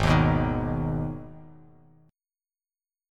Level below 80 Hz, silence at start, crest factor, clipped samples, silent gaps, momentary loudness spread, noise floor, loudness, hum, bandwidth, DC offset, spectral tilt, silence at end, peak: -38 dBFS; 0 s; 20 dB; under 0.1%; none; 18 LU; under -90 dBFS; -26 LUFS; none; 11 kHz; under 0.1%; -7.5 dB/octave; 1.65 s; -8 dBFS